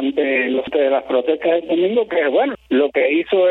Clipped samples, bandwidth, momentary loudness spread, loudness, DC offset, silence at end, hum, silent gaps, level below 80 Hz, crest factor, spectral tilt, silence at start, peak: under 0.1%; 4.1 kHz; 3 LU; -17 LUFS; under 0.1%; 0 s; none; none; -58 dBFS; 12 dB; -7.5 dB/octave; 0 s; -4 dBFS